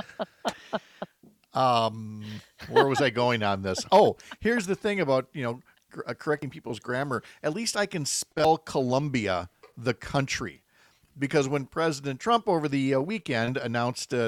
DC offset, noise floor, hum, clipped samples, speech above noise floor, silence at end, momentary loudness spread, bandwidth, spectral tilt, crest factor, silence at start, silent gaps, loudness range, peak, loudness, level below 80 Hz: under 0.1%; -62 dBFS; none; under 0.1%; 36 dB; 0 s; 14 LU; 18 kHz; -4.5 dB/octave; 20 dB; 0 s; none; 5 LU; -6 dBFS; -27 LUFS; -60 dBFS